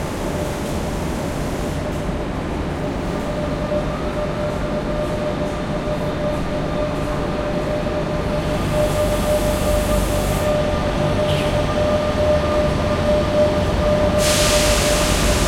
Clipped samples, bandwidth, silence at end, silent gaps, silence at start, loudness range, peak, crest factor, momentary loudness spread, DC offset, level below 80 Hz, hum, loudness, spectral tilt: under 0.1%; 16.5 kHz; 0 s; none; 0 s; 6 LU; -4 dBFS; 16 dB; 8 LU; under 0.1%; -28 dBFS; none; -20 LUFS; -5 dB/octave